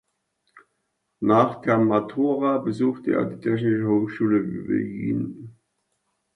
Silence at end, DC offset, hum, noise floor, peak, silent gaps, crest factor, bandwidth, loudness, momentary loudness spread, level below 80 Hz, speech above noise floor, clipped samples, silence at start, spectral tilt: 0.85 s; under 0.1%; none; -76 dBFS; -6 dBFS; none; 18 dB; 7.8 kHz; -23 LUFS; 7 LU; -62 dBFS; 53 dB; under 0.1%; 0.55 s; -9 dB/octave